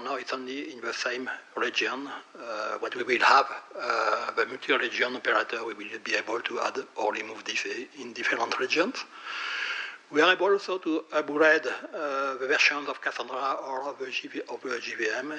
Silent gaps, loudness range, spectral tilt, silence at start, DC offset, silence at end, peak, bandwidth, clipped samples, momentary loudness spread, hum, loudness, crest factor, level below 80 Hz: none; 4 LU; -2 dB/octave; 0 s; under 0.1%; 0 s; -6 dBFS; 9.8 kHz; under 0.1%; 12 LU; none; -28 LUFS; 22 dB; -90 dBFS